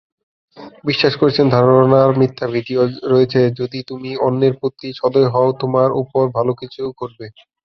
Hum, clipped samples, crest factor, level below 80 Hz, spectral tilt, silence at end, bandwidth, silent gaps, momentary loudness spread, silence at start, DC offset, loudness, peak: none; under 0.1%; 16 dB; -54 dBFS; -8.5 dB/octave; 0.35 s; 6.2 kHz; none; 14 LU; 0.55 s; under 0.1%; -16 LUFS; 0 dBFS